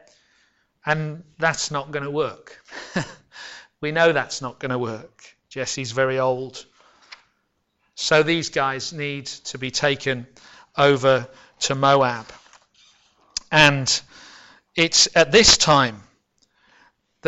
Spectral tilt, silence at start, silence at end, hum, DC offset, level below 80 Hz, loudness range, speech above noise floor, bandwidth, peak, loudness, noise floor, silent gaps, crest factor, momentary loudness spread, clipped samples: -3 dB/octave; 0.85 s; 0 s; none; under 0.1%; -50 dBFS; 10 LU; 51 dB; 11.5 kHz; 0 dBFS; -20 LUFS; -71 dBFS; none; 22 dB; 18 LU; under 0.1%